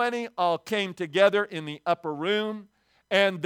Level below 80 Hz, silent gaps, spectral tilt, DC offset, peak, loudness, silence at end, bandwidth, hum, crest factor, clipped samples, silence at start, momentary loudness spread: -78 dBFS; none; -4.5 dB/octave; under 0.1%; -6 dBFS; -26 LUFS; 0 s; 16.5 kHz; none; 20 dB; under 0.1%; 0 s; 11 LU